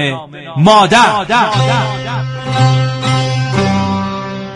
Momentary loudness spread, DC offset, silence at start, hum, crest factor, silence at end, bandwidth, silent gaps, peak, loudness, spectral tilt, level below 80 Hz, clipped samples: 12 LU; under 0.1%; 0 s; none; 12 dB; 0 s; 11.5 kHz; none; 0 dBFS; -12 LUFS; -5.5 dB/octave; -44 dBFS; under 0.1%